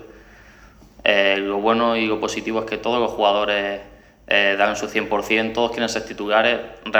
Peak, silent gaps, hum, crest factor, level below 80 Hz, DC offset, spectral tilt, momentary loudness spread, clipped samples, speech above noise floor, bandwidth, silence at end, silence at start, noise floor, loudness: 0 dBFS; none; none; 20 dB; -52 dBFS; under 0.1%; -3.5 dB/octave; 7 LU; under 0.1%; 27 dB; over 20 kHz; 0 s; 0 s; -47 dBFS; -20 LUFS